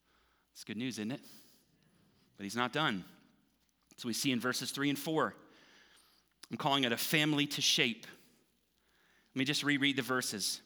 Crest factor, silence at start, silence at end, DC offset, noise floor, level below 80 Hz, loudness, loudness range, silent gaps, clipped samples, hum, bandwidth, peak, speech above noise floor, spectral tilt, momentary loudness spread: 24 dB; 0.55 s; 0.05 s; under 0.1%; -75 dBFS; -84 dBFS; -33 LUFS; 7 LU; none; under 0.1%; none; over 20 kHz; -14 dBFS; 41 dB; -3 dB/octave; 15 LU